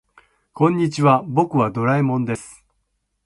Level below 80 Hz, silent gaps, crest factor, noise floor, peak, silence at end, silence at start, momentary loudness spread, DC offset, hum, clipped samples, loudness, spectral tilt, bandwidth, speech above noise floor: -58 dBFS; none; 18 dB; -71 dBFS; -2 dBFS; 0.75 s; 0.55 s; 7 LU; under 0.1%; none; under 0.1%; -19 LUFS; -7.5 dB/octave; 11.5 kHz; 53 dB